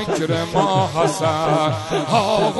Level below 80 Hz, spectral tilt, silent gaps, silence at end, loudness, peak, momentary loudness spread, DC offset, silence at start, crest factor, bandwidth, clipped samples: -48 dBFS; -5 dB/octave; none; 0 s; -19 LUFS; -2 dBFS; 3 LU; under 0.1%; 0 s; 16 dB; 11.5 kHz; under 0.1%